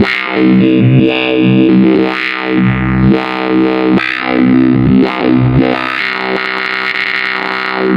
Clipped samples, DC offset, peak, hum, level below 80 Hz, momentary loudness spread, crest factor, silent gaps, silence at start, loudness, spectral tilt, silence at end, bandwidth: under 0.1%; under 0.1%; 0 dBFS; none; -34 dBFS; 6 LU; 10 dB; none; 0 s; -11 LUFS; -8 dB/octave; 0 s; 6.6 kHz